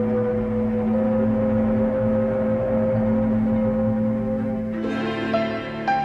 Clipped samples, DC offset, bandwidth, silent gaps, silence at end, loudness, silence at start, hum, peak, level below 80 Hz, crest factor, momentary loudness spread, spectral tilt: under 0.1%; under 0.1%; 5.8 kHz; none; 0 s; -22 LUFS; 0 s; none; -10 dBFS; -42 dBFS; 12 dB; 4 LU; -9 dB/octave